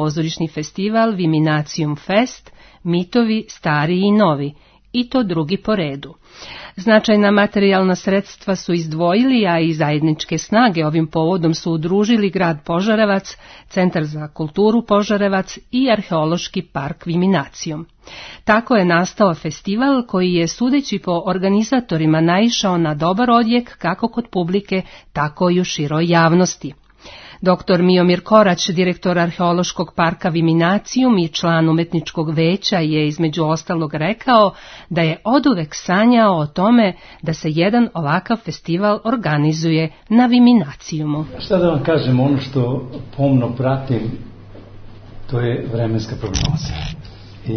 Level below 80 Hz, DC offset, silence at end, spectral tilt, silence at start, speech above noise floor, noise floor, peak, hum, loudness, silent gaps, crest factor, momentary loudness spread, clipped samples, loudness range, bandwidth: -44 dBFS; under 0.1%; 0 s; -6 dB/octave; 0 s; 23 dB; -40 dBFS; 0 dBFS; none; -17 LUFS; none; 16 dB; 10 LU; under 0.1%; 3 LU; 6.6 kHz